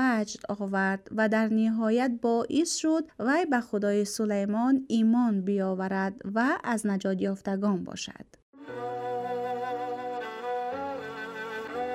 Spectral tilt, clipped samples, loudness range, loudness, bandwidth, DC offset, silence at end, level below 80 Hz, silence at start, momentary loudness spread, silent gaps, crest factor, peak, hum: -5 dB/octave; under 0.1%; 7 LU; -29 LUFS; 13.5 kHz; under 0.1%; 0 s; -70 dBFS; 0 s; 10 LU; 8.42-8.53 s; 14 dB; -14 dBFS; none